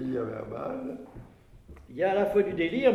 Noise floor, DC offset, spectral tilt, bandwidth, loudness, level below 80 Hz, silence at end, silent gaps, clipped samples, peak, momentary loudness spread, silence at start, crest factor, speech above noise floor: -50 dBFS; under 0.1%; -7.5 dB/octave; 13 kHz; -29 LUFS; -56 dBFS; 0 s; none; under 0.1%; -12 dBFS; 19 LU; 0 s; 18 dB; 23 dB